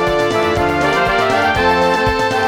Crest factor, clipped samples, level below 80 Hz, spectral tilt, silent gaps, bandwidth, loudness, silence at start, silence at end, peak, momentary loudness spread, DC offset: 12 dB; under 0.1%; -34 dBFS; -5 dB/octave; none; 19 kHz; -14 LUFS; 0 s; 0 s; -2 dBFS; 2 LU; under 0.1%